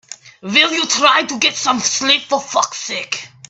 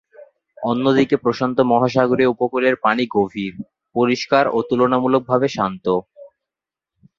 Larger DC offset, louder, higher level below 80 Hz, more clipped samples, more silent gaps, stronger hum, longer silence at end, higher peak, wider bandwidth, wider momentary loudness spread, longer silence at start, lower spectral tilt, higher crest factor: neither; first, -15 LUFS vs -18 LUFS; second, -66 dBFS vs -58 dBFS; neither; neither; neither; second, 0.25 s vs 0.9 s; about the same, 0 dBFS vs 0 dBFS; first, 11.5 kHz vs 7.4 kHz; first, 10 LU vs 7 LU; about the same, 0.1 s vs 0.2 s; second, -0.5 dB/octave vs -6.5 dB/octave; about the same, 18 dB vs 18 dB